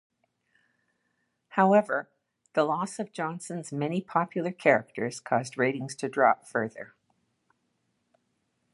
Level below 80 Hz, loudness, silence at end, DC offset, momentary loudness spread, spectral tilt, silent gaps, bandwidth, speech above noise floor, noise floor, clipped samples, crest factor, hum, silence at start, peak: -78 dBFS; -28 LUFS; 1.9 s; under 0.1%; 11 LU; -5.5 dB/octave; none; 11.5 kHz; 49 dB; -77 dBFS; under 0.1%; 22 dB; none; 1.55 s; -6 dBFS